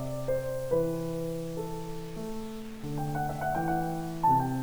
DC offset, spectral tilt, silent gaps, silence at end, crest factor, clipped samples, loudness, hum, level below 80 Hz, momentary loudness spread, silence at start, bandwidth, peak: 0.5%; -7 dB/octave; none; 0 s; 16 dB; under 0.1%; -32 LUFS; none; -48 dBFS; 12 LU; 0 s; over 20 kHz; -14 dBFS